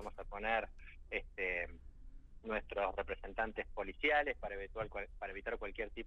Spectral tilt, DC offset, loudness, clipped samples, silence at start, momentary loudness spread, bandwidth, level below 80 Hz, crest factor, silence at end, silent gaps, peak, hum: -6 dB/octave; under 0.1%; -40 LUFS; under 0.1%; 0 s; 12 LU; 8.6 kHz; -52 dBFS; 20 dB; 0 s; none; -22 dBFS; none